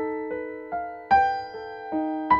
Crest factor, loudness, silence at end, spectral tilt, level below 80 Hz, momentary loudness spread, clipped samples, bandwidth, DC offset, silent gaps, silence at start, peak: 18 dB; -27 LUFS; 0 s; -6.5 dB/octave; -54 dBFS; 13 LU; under 0.1%; 7 kHz; under 0.1%; none; 0 s; -8 dBFS